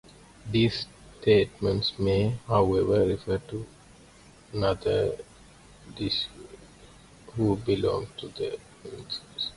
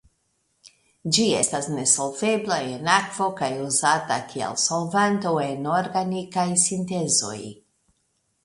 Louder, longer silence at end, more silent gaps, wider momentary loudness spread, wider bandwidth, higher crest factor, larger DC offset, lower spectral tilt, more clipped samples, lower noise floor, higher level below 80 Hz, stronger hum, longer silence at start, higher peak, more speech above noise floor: second, -27 LUFS vs -22 LUFS; second, 0 s vs 0.9 s; neither; first, 17 LU vs 7 LU; about the same, 11.5 kHz vs 11.5 kHz; about the same, 20 dB vs 20 dB; neither; first, -6.5 dB/octave vs -3 dB/octave; neither; second, -53 dBFS vs -71 dBFS; first, -48 dBFS vs -64 dBFS; neither; second, 0.45 s vs 1.05 s; second, -10 dBFS vs -4 dBFS; second, 27 dB vs 48 dB